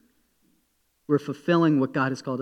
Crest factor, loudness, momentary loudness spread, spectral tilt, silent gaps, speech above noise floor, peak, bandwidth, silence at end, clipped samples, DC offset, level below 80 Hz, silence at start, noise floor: 16 dB; -24 LUFS; 6 LU; -7.5 dB/octave; none; 47 dB; -10 dBFS; 9.4 kHz; 0 s; under 0.1%; under 0.1%; -76 dBFS; 1.1 s; -70 dBFS